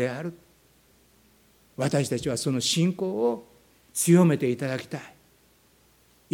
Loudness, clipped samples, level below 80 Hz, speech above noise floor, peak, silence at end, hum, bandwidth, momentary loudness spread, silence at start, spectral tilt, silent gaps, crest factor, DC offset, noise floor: -25 LUFS; under 0.1%; -64 dBFS; 37 dB; -8 dBFS; 1.25 s; none; 17 kHz; 18 LU; 0 s; -5 dB/octave; none; 20 dB; under 0.1%; -61 dBFS